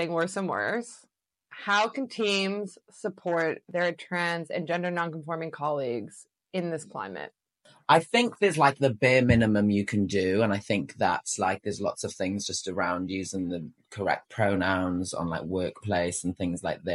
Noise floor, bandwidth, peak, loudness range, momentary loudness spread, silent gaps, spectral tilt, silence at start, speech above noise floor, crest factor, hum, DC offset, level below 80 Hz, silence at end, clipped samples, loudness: -61 dBFS; 12 kHz; -6 dBFS; 7 LU; 13 LU; none; -5 dB/octave; 0 s; 34 dB; 22 dB; none; under 0.1%; -58 dBFS; 0 s; under 0.1%; -28 LUFS